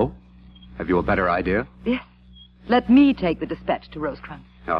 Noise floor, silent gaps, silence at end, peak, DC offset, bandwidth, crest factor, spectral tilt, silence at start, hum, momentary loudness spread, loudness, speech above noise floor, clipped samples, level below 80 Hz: -48 dBFS; none; 0 s; -6 dBFS; under 0.1%; 5.4 kHz; 16 dB; -9 dB/octave; 0 s; none; 21 LU; -22 LUFS; 28 dB; under 0.1%; -42 dBFS